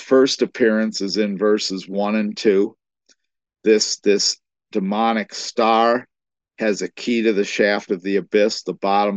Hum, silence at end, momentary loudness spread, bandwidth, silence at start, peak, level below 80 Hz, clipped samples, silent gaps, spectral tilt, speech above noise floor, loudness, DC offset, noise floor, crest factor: none; 0 s; 7 LU; 8.6 kHz; 0 s; -2 dBFS; -72 dBFS; under 0.1%; none; -4 dB/octave; 44 dB; -19 LUFS; under 0.1%; -62 dBFS; 16 dB